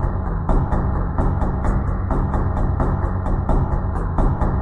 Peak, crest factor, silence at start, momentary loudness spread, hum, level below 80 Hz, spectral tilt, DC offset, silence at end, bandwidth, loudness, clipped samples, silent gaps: -6 dBFS; 14 dB; 0 s; 2 LU; none; -22 dBFS; -10 dB/octave; under 0.1%; 0 s; 4 kHz; -22 LUFS; under 0.1%; none